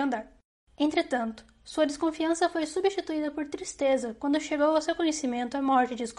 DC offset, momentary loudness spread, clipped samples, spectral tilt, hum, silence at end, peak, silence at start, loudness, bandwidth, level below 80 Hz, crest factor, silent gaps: under 0.1%; 9 LU; under 0.1%; -3 dB/octave; none; 0.05 s; -12 dBFS; 0 s; -28 LUFS; 11.5 kHz; -62 dBFS; 16 dB; 0.44-0.67 s